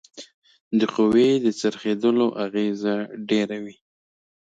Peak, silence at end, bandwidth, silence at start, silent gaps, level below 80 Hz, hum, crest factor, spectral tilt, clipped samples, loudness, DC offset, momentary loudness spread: -8 dBFS; 0.7 s; 9.2 kHz; 0.15 s; 0.34-0.42 s, 0.60-0.71 s; -64 dBFS; none; 16 dB; -6 dB/octave; under 0.1%; -22 LUFS; under 0.1%; 14 LU